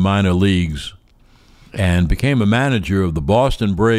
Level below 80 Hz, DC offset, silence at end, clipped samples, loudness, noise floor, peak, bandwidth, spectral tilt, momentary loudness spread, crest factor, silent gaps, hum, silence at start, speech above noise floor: -30 dBFS; under 0.1%; 0 s; under 0.1%; -17 LUFS; -50 dBFS; -4 dBFS; 14.5 kHz; -7 dB/octave; 9 LU; 12 dB; none; none; 0 s; 35 dB